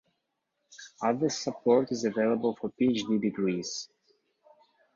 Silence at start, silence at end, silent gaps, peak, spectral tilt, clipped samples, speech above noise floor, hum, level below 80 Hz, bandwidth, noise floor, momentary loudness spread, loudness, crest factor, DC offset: 0.7 s; 1.1 s; none; -12 dBFS; -5 dB/octave; under 0.1%; 53 dB; none; -72 dBFS; 7.6 kHz; -81 dBFS; 12 LU; -29 LUFS; 18 dB; under 0.1%